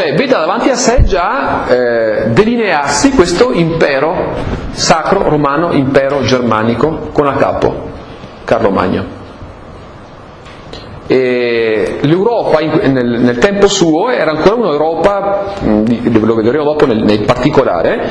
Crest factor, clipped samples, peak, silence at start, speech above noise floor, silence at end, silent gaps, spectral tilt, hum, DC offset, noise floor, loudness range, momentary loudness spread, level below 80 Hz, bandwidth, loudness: 12 dB; 0.5%; 0 dBFS; 0 s; 22 dB; 0 s; none; -5.5 dB/octave; none; under 0.1%; -32 dBFS; 6 LU; 9 LU; -28 dBFS; 11 kHz; -11 LUFS